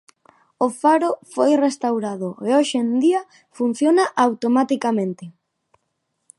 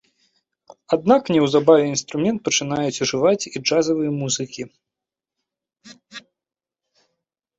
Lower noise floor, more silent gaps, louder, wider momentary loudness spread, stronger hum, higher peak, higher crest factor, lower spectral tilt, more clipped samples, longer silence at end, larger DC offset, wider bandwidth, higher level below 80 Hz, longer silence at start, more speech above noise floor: second, -74 dBFS vs -89 dBFS; neither; about the same, -20 LUFS vs -19 LUFS; second, 8 LU vs 20 LU; neither; about the same, -2 dBFS vs -2 dBFS; about the same, 18 dB vs 20 dB; about the same, -5 dB/octave vs -4 dB/octave; neither; second, 1.1 s vs 1.4 s; neither; first, 11.5 kHz vs 8.2 kHz; second, -76 dBFS vs -62 dBFS; second, 0.6 s vs 0.9 s; second, 55 dB vs 70 dB